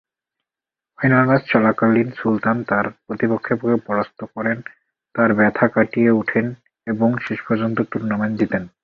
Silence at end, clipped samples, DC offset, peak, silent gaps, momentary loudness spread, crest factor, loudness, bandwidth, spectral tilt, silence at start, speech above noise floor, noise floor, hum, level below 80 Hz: 0.15 s; under 0.1%; under 0.1%; -2 dBFS; none; 10 LU; 18 dB; -19 LUFS; 5 kHz; -9.5 dB/octave; 1 s; 70 dB; -89 dBFS; none; -56 dBFS